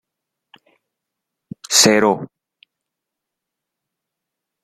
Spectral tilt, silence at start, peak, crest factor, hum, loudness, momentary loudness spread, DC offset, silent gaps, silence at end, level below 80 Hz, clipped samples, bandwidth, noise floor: -2 dB/octave; 1.7 s; 0 dBFS; 22 dB; none; -14 LUFS; 26 LU; under 0.1%; none; 2.4 s; -64 dBFS; under 0.1%; 16 kHz; -82 dBFS